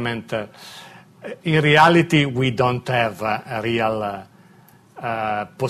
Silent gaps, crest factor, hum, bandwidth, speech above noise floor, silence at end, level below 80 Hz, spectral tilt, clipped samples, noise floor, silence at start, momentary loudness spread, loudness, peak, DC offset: none; 18 dB; none; 14 kHz; 31 dB; 0 s; -54 dBFS; -6 dB/octave; under 0.1%; -50 dBFS; 0 s; 23 LU; -19 LUFS; -4 dBFS; under 0.1%